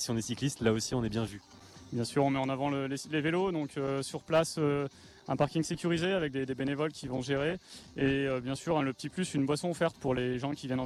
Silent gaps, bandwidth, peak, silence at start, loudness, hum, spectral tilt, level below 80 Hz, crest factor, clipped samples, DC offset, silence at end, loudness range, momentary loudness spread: none; 13.5 kHz; -14 dBFS; 0 s; -32 LUFS; none; -5.5 dB/octave; -58 dBFS; 18 dB; under 0.1%; under 0.1%; 0 s; 1 LU; 7 LU